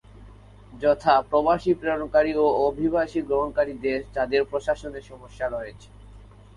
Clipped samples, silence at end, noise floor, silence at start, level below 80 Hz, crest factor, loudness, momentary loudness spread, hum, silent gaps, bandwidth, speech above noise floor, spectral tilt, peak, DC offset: under 0.1%; 0.35 s; -47 dBFS; 0.2 s; -48 dBFS; 20 dB; -24 LUFS; 10 LU; none; none; 11 kHz; 23 dB; -6.5 dB/octave; -4 dBFS; under 0.1%